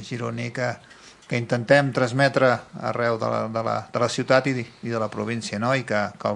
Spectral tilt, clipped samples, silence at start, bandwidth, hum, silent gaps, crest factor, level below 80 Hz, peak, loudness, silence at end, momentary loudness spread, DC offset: -5.5 dB/octave; under 0.1%; 0 s; 11 kHz; none; none; 22 dB; -64 dBFS; -2 dBFS; -23 LUFS; 0 s; 10 LU; under 0.1%